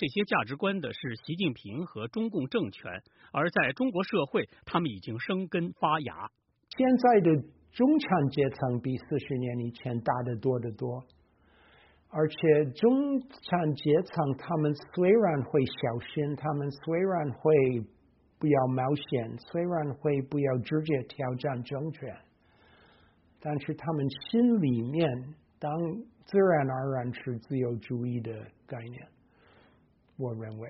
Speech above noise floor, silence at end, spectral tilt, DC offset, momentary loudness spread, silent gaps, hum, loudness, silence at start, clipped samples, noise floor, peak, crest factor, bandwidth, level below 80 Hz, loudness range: 36 dB; 0 s; -6 dB/octave; under 0.1%; 14 LU; none; none; -29 LUFS; 0 s; under 0.1%; -64 dBFS; -10 dBFS; 20 dB; 5.8 kHz; -66 dBFS; 7 LU